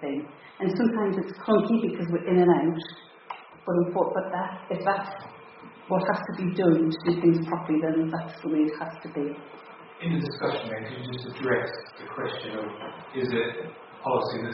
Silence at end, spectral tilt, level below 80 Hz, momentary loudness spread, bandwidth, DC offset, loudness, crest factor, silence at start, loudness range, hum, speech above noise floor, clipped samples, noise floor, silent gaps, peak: 0 s; -6 dB/octave; -68 dBFS; 19 LU; 5.8 kHz; under 0.1%; -27 LUFS; 20 dB; 0 s; 6 LU; none; 21 dB; under 0.1%; -47 dBFS; none; -8 dBFS